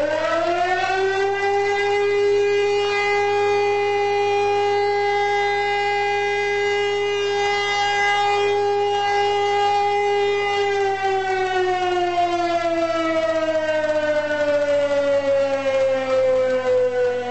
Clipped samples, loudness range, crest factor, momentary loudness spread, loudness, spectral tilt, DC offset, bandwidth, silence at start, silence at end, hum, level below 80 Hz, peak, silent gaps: under 0.1%; 1 LU; 10 dB; 2 LU; -20 LUFS; -3.5 dB/octave; 0.6%; 8.4 kHz; 0 s; 0 s; 50 Hz at -45 dBFS; -56 dBFS; -10 dBFS; none